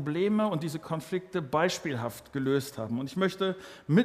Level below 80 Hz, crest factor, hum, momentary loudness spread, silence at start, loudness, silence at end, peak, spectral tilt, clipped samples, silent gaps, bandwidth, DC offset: -66 dBFS; 18 dB; none; 8 LU; 0 s; -31 LUFS; 0 s; -10 dBFS; -6 dB/octave; under 0.1%; none; 15.5 kHz; under 0.1%